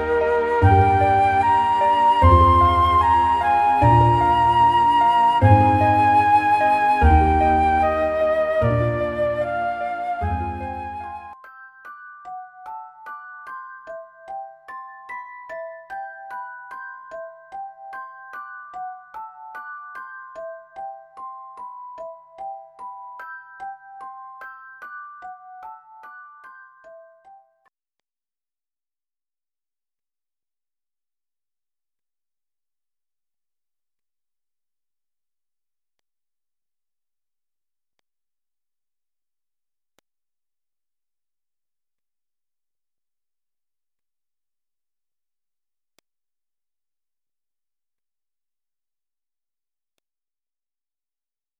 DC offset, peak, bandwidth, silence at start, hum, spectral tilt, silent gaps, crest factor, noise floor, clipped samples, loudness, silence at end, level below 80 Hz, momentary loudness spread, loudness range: under 0.1%; -2 dBFS; 12 kHz; 0 s; none; -7.5 dB/octave; none; 22 dB; under -90 dBFS; under 0.1%; -17 LUFS; 24.65 s; -36 dBFS; 23 LU; 22 LU